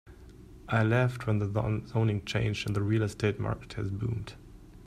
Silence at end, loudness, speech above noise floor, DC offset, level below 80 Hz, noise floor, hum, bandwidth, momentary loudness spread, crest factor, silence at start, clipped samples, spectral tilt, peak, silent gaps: 0 s; -30 LUFS; 21 dB; under 0.1%; -50 dBFS; -50 dBFS; none; 12 kHz; 9 LU; 18 dB; 0.05 s; under 0.1%; -7 dB/octave; -12 dBFS; none